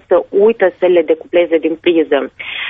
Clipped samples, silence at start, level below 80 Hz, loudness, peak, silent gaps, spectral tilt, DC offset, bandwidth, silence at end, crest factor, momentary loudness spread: under 0.1%; 0.1 s; -56 dBFS; -13 LUFS; -2 dBFS; none; -8 dB/octave; under 0.1%; 3.9 kHz; 0 s; 12 dB; 5 LU